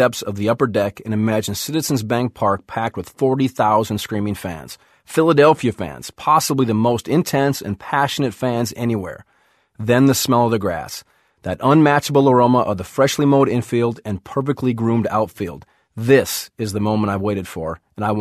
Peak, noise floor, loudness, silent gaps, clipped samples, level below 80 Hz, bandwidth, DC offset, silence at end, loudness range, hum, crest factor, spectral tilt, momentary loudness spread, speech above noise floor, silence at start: 0 dBFS; -60 dBFS; -18 LUFS; none; under 0.1%; -48 dBFS; 14.5 kHz; under 0.1%; 0 s; 4 LU; none; 18 dB; -5.5 dB/octave; 13 LU; 42 dB; 0 s